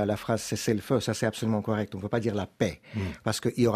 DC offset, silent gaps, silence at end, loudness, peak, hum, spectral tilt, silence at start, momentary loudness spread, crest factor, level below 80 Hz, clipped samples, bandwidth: under 0.1%; none; 0 s; -29 LUFS; -12 dBFS; none; -5.5 dB/octave; 0 s; 5 LU; 18 dB; -58 dBFS; under 0.1%; 15.5 kHz